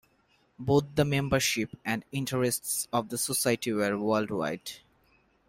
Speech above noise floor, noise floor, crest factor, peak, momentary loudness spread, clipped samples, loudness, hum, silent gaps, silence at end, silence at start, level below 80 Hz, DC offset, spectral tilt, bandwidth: 39 dB; -68 dBFS; 20 dB; -10 dBFS; 8 LU; under 0.1%; -29 LUFS; none; none; 0.7 s; 0.6 s; -58 dBFS; under 0.1%; -4 dB/octave; 16 kHz